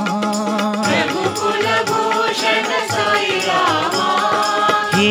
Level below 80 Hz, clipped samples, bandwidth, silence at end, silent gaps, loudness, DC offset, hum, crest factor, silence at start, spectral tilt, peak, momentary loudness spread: -62 dBFS; under 0.1%; 18.5 kHz; 0 s; none; -16 LUFS; under 0.1%; none; 14 dB; 0 s; -3.5 dB/octave; -2 dBFS; 3 LU